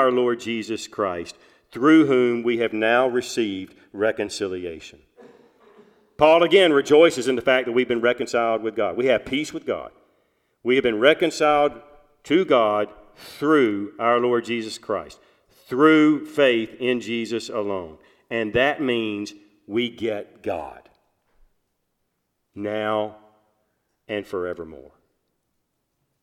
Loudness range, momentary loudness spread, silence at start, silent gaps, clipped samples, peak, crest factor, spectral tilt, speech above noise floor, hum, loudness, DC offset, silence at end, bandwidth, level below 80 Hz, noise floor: 13 LU; 16 LU; 0 s; none; under 0.1%; -2 dBFS; 20 dB; -4.5 dB/octave; 54 dB; none; -21 LUFS; under 0.1%; 1.45 s; 13.5 kHz; -60 dBFS; -75 dBFS